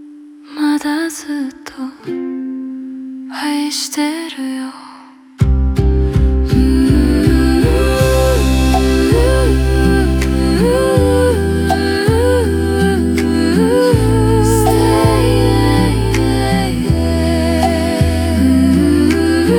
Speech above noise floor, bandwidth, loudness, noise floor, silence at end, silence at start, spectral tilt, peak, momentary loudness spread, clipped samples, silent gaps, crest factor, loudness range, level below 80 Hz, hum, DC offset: 18 dB; 18 kHz; -14 LUFS; -38 dBFS; 0 s; 0 s; -6.5 dB/octave; 0 dBFS; 11 LU; under 0.1%; none; 12 dB; 9 LU; -20 dBFS; none; under 0.1%